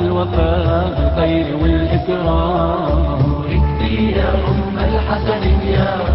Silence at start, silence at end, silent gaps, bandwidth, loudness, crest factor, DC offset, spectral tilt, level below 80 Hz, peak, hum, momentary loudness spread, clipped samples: 0 s; 0 s; none; 5.8 kHz; -16 LUFS; 12 dB; under 0.1%; -12.5 dB/octave; -20 dBFS; -2 dBFS; none; 2 LU; under 0.1%